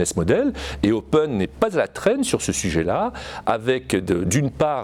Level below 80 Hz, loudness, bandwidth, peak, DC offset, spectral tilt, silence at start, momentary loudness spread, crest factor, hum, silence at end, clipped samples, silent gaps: -40 dBFS; -22 LUFS; 17 kHz; -6 dBFS; under 0.1%; -5 dB/octave; 0 s; 4 LU; 16 dB; none; 0 s; under 0.1%; none